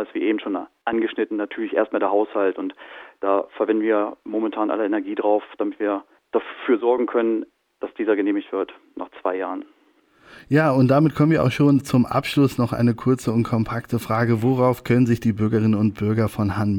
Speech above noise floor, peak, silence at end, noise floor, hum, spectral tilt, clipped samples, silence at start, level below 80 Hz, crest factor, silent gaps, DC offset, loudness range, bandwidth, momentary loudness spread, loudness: 38 dB; -6 dBFS; 0 s; -59 dBFS; none; -8 dB/octave; under 0.1%; 0 s; -54 dBFS; 16 dB; none; under 0.1%; 5 LU; 18 kHz; 10 LU; -21 LUFS